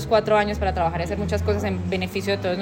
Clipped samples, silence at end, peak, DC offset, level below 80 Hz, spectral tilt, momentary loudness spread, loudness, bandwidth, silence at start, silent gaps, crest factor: under 0.1%; 0 s; -6 dBFS; under 0.1%; -36 dBFS; -6 dB/octave; 6 LU; -23 LUFS; 16.5 kHz; 0 s; none; 16 dB